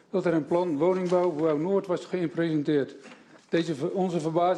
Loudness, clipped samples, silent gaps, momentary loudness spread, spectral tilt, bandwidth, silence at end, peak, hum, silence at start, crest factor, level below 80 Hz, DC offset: -27 LUFS; under 0.1%; none; 5 LU; -7.5 dB/octave; 10 kHz; 0 s; -12 dBFS; none; 0.15 s; 14 dB; -74 dBFS; under 0.1%